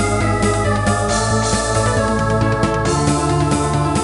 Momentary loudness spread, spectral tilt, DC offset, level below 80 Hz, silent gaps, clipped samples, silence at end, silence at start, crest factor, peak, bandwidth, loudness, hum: 1 LU; -5 dB/octave; under 0.1%; -28 dBFS; none; under 0.1%; 0 s; 0 s; 14 dB; -2 dBFS; 11.5 kHz; -17 LUFS; none